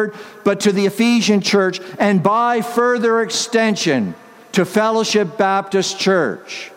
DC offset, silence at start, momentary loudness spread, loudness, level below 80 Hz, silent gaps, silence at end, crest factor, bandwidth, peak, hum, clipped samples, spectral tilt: under 0.1%; 0 s; 6 LU; -16 LUFS; -64 dBFS; none; 0 s; 16 dB; 16 kHz; 0 dBFS; none; under 0.1%; -4.5 dB/octave